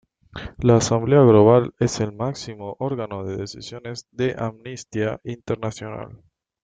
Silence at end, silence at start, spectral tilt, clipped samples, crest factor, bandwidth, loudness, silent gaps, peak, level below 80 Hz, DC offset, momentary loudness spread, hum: 0.5 s; 0.35 s; -6.5 dB/octave; under 0.1%; 20 dB; 9.4 kHz; -20 LUFS; none; -2 dBFS; -50 dBFS; under 0.1%; 20 LU; none